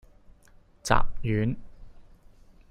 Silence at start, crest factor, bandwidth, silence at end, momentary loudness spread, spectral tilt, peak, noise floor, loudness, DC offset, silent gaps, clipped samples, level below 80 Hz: 0.85 s; 22 dB; 10.5 kHz; 0.7 s; 13 LU; -5.5 dB/octave; -6 dBFS; -56 dBFS; -29 LUFS; under 0.1%; none; under 0.1%; -38 dBFS